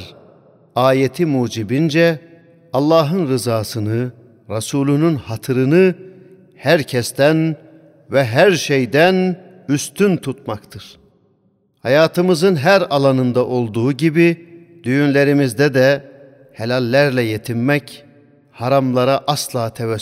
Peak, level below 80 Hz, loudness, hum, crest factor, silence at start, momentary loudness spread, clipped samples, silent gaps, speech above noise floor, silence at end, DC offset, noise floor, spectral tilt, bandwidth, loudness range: 0 dBFS; -60 dBFS; -16 LUFS; none; 16 dB; 0 s; 12 LU; under 0.1%; none; 45 dB; 0 s; under 0.1%; -60 dBFS; -6 dB/octave; 16 kHz; 3 LU